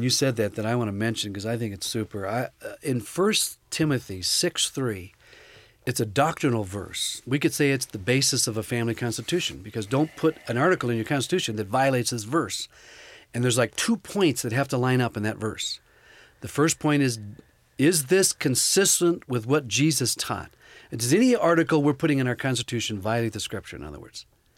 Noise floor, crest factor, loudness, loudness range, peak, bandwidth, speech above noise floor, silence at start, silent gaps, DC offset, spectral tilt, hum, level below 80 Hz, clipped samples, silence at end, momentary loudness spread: -54 dBFS; 18 dB; -24 LUFS; 4 LU; -8 dBFS; 16.5 kHz; 29 dB; 0 s; none; under 0.1%; -4 dB/octave; none; -58 dBFS; under 0.1%; 0.35 s; 12 LU